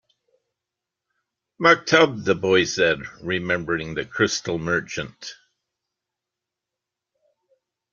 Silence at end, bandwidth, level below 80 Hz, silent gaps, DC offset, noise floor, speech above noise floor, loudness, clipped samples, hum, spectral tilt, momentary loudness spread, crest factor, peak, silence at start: 2.6 s; 7.4 kHz; -58 dBFS; none; under 0.1%; -86 dBFS; 64 dB; -21 LUFS; under 0.1%; none; -4 dB/octave; 14 LU; 24 dB; 0 dBFS; 1.6 s